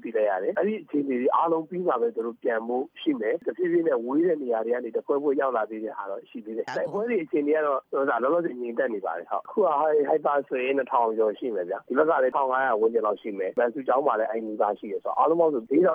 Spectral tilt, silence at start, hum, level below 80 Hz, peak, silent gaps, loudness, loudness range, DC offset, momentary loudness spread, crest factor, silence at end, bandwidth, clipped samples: -7.5 dB/octave; 0.05 s; none; -82 dBFS; -8 dBFS; none; -26 LUFS; 3 LU; under 0.1%; 8 LU; 16 dB; 0 s; 7 kHz; under 0.1%